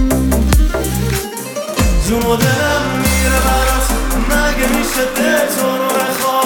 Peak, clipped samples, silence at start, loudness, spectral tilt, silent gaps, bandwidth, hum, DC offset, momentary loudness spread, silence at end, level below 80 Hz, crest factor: 0 dBFS; under 0.1%; 0 s; -15 LUFS; -4.5 dB/octave; none; over 20 kHz; none; under 0.1%; 4 LU; 0 s; -18 dBFS; 12 dB